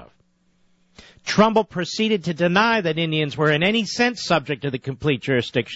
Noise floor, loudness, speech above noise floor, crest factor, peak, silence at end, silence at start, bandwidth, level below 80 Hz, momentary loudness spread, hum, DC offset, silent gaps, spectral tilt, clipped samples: -62 dBFS; -20 LUFS; 42 dB; 16 dB; -6 dBFS; 0 s; 0 s; 8 kHz; -56 dBFS; 8 LU; none; under 0.1%; none; -5 dB/octave; under 0.1%